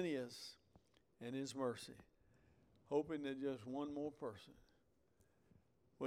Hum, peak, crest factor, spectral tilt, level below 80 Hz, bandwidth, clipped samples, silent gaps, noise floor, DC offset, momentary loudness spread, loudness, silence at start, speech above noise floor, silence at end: none; -28 dBFS; 20 dB; -5.5 dB/octave; -80 dBFS; 16 kHz; under 0.1%; none; -79 dBFS; under 0.1%; 14 LU; -46 LUFS; 0 s; 33 dB; 0 s